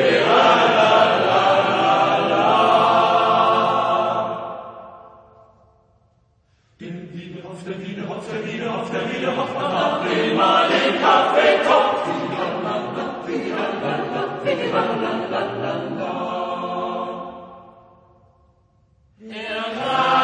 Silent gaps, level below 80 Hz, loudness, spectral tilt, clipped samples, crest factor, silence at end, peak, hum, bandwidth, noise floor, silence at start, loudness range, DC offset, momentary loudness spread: none; -62 dBFS; -19 LUFS; -5 dB/octave; under 0.1%; 18 dB; 0 s; -2 dBFS; none; 9.6 kHz; -61 dBFS; 0 s; 16 LU; under 0.1%; 18 LU